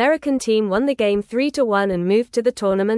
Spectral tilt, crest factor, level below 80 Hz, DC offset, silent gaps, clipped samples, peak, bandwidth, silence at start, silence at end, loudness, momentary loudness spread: -5.5 dB/octave; 14 dB; -52 dBFS; under 0.1%; none; under 0.1%; -6 dBFS; 12 kHz; 0 s; 0 s; -19 LUFS; 2 LU